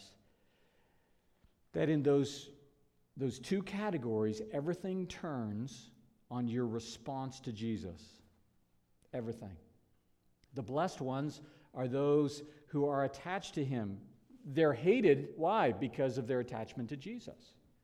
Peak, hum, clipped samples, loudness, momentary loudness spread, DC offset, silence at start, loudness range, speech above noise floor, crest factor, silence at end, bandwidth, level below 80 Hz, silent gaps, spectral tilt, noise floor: -16 dBFS; none; under 0.1%; -36 LUFS; 17 LU; under 0.1%; 0 s; 10 LU; 37 dB; 22 dB; 0.5 s; 12.5 kHz; -70 dBFS; none; -6.5 dB/octave; -73 dBFS